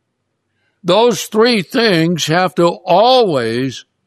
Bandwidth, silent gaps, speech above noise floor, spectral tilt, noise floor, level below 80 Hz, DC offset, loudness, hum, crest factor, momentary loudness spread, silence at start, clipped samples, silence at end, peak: 14 kHz; none; 57 dB; -4.5 dB/octave; -70 dBFS; -62 dBFS; under 0.1%; -13 LUFS; none; 14 dB; 8 LU; 0.85 s; under 0.1%; 0.25 s; 0 dBFS